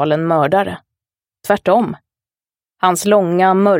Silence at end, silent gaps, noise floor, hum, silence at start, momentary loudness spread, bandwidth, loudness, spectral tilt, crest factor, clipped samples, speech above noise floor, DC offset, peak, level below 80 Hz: 0 s; none; under -90 dBFS; none; 0 s; 15 LU; 16.5 kHz; -15 LUFS; -5.5 dB/octave; 16 dB; under 0.1%; over 76 dB; under 0.1%; 0 dBFS; -58 dBFS